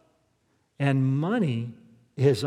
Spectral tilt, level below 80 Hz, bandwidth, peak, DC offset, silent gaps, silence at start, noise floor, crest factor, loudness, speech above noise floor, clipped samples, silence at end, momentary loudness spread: -7.5 dB/octave; -76 dBFS; 12 kHz; -8 dBFS; under 0.1%; none; 0.8 s; -70 dBFS; 18 dB; -26 LUFS; 46 dB; under 0.1%; 0 s; 13 LU